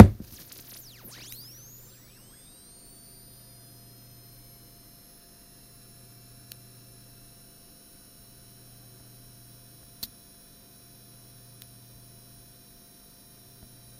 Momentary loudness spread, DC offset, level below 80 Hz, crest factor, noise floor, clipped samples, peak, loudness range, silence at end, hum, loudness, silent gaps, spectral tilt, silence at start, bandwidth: 8 LU; under 0.1%; -46 dBFS; 30 dB; -53 dBFS; under 0.1%; 0 dBFS; 4 LU; 13.9 s; none; -29 LUFS; none; -6.5 dB/octave; 0 s; 16 kHz